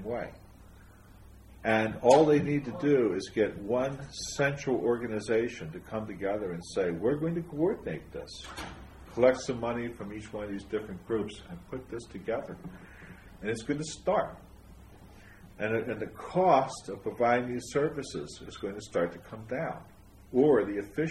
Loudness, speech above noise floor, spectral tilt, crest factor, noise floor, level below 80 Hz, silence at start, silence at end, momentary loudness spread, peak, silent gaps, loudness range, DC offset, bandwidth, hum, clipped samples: -30 LUFS; 23 dB; -6 dB/octave; 24 dB; -53 dBFS; -56 dBFS; 0 s; 0 s; 17 LU; -8 dBFS; none; 9 LU; under 0.1%; 13 kHz; none; under 0.1%